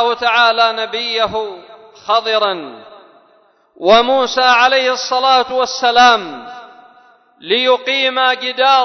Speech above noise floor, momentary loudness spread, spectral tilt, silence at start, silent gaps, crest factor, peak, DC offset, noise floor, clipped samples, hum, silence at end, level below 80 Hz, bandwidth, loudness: 39 dB; 14 LU; -1.5 dB/octave; 0 s; none; 14 dB; 0 dBFS; under 0.1%; -53 dBFS; under 0.1%; none; 0 s; -56 dBFS; 6.4 kHz; -13 LUFS